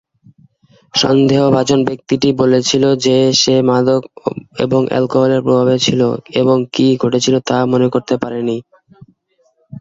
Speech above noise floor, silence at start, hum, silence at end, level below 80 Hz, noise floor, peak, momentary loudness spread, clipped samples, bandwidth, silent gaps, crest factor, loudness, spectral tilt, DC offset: 46 dB; 0.95 s; none; 0 s; -52 dBFS; -59 dBFS; 0 dBFS; 8 LU; under 0.1%; 7.8 kHz; none; 14 dB; -13 LUFS; -5 dB/octave; under 0.1%